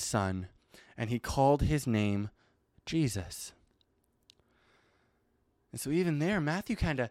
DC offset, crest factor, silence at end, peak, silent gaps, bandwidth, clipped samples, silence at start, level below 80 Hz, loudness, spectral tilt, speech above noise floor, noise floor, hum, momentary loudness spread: under 0.1%; 18 dB; 0 s; -14 dBFS; none; 16 kHz; under 0.1%; 0 s; -48 dBFS; -32 LUFS; -5.5 dB/octave; 43 dB; -74 dBFS; none; 16 LU